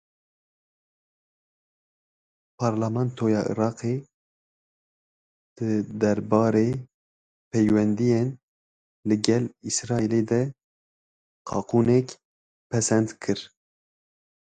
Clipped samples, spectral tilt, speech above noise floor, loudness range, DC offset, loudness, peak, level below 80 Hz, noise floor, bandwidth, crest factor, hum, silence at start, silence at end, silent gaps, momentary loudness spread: under 0.1%; -6 dB/octave; over 67 dB; 4 LU; under 0.1%; -25 LUFS; -2 dBFS; -60 dBFS; under -90 dBFS; 9.4 kHz; 26 dB; none; 2.6 s; 0.95 s; 4.14-5.56 s, 6.94-7.51 s, 8.43-9.03 s, 10.64-11.45 s, 12.25-12.70 s; 11 LU